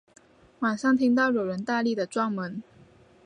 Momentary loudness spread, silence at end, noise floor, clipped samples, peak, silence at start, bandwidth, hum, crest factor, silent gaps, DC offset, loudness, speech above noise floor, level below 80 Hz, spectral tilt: 11 LU; 0.65 s; -55 dBFS; under 0.1%; -12 dBFS; 0.6 s; 10 kHz; none; 16 dB; none; under 0.1%; -26 LUFS; 30 dB; -70 dBFS; -6 dB/octave